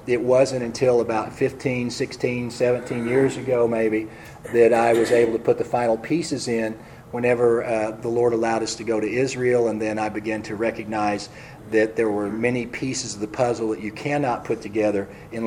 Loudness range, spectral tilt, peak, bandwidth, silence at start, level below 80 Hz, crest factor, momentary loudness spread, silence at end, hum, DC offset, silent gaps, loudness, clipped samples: 4 LU; -5.5 dB/octave; -4 dBFS; 13.5 kHz; 0 s; -54 dBFS; 18 dB; 8 LU; 0 s; none; under 0.1%; none; -22 LUFS; under 0.1%